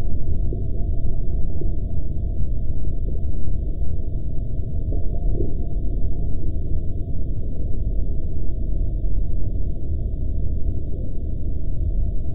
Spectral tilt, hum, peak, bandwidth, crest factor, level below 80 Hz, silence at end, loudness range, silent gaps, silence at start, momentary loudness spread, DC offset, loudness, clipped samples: -13.5 dB/octave; none; -6 dBFS; 0.7 kHz; 10 dB; -24 dBFS; 0 s; 1 LU; none; 0 s; 3 LU; under 0.1%; -28 LUFS; under 0.1%